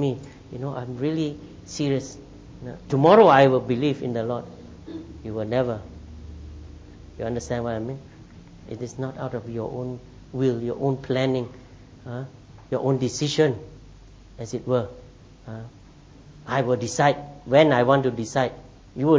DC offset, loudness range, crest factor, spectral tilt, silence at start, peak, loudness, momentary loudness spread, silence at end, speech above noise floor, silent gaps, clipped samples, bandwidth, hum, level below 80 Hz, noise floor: under 0.1%; 11 LU; 22 dB; -6 dB/octave; 0 s; -4 dBFS; -23 LUFS; 23 LU; 0 s; 25 dB; none; under 0.1%; 8 kHz; none; -50 dBFS; -48 dBFS